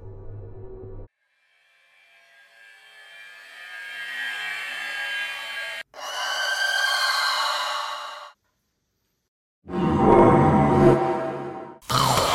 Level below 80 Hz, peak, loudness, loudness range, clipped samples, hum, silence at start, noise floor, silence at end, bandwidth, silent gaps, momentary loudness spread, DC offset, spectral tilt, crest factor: -48 dBFS; -4 dBFS; -22 LUFS; 14 LU; under 0.1%; none; 0 s; -74 dBFS; 0 s; 16.5 kHz; 9.28-9.62 s; 24 LU; under 0.1%; -4.5 dB/octave; 22 dB